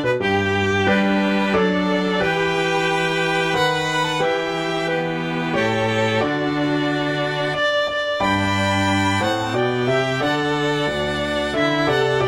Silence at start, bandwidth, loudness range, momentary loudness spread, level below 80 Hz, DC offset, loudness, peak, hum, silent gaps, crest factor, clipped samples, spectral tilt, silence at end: 0 s; 16 kHz; 2 LU; 3 LU; -48 dBFS; 0.2%; -19 LUFS; -6 dBFS; none; none; 14 dB; under 0.1%; -5 dB/octave; 0 s